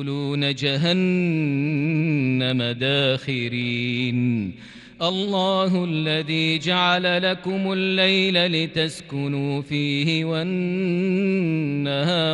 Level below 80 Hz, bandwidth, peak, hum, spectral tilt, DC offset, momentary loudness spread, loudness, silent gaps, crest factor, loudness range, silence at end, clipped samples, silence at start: -62 dBFS; 11.5 kHz; -6 dBFS; none; -6 dB/octave; under 0.1%; 6 LU; -22 LUFS; none; 14 dB; 3 LU; 0 s; under 0.1%; 0 s